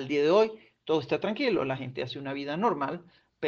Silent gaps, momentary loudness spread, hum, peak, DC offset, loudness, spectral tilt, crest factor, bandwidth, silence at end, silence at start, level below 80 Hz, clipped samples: none; 11 LU; none; -12 dBFS; under 0.1%; -29 LUFS; -6.5 dB/octave; 18 dB; 7 kHz; 0 s; 0 s; -70 dBFS; under 0.1%